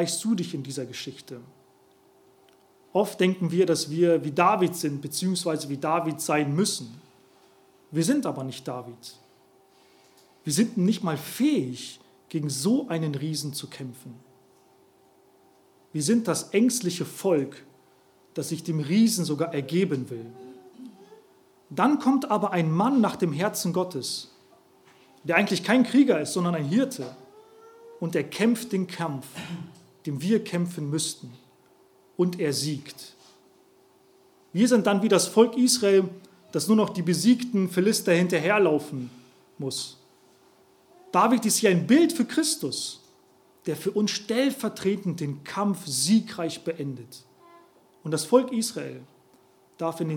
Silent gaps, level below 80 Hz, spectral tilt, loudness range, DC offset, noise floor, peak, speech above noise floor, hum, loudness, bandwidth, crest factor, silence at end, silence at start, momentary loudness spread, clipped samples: none; -78 dBFS; -5 dB/octave; 7 LU; under 0.1%; -59 dBFS; -4 dBFS; 35 dB; none; -25 LUFS; 18.5 kHz; 22 dB; 0 s; 0 s; 17 LU; under 0.1%